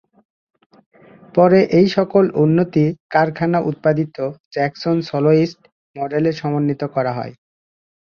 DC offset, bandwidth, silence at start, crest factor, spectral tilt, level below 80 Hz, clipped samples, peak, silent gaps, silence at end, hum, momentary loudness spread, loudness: under 0.1%; 6.8 kHz; 1.35 s; 16 dB; -8.5 dB/octave; -58 dBFS; under 0.1%; -2 dBFS; 3.00-3.09 s, 4.40-4.51 s, 5.72-5.94 s; 0.7 s; none; 10 LU; -17 LUFS